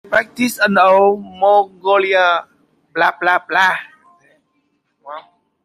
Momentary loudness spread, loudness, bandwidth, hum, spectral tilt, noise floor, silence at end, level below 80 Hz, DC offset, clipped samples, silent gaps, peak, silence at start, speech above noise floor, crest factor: 16 LU; -14 LUFS; 16 kHz; none; -4 dB/octave; -65 dBFS; 0.45 s; -64 dBFS; under 0.1%; under 0.1%; none; -2 dBFS; 0.1 s; 51 dB; 14 dB